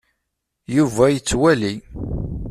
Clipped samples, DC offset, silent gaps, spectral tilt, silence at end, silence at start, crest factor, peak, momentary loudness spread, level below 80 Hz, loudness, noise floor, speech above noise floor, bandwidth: under 0.1%; under 0.1%; none; -5.5 dB/octave; 0 s; 0.7 s; 16 dB; -2 dBFS; 12 LU; -36 dBFS; -19 LUFS; -77 dBFS; 59 dB; 14 kHz